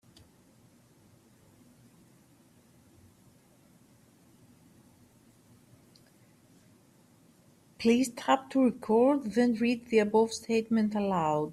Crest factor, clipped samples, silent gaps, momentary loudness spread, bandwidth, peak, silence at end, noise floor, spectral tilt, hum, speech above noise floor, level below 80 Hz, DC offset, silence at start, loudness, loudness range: 20 dB; under 0.1%; none; 4 LU; 13.5 kHz; -12 dBFS; 0 s; -62 dBFS; -5.5 dB/octave; none; 35 dB; -72 dBFS; under 0.1%; 7.8 s; -28 LUFS; 8 LU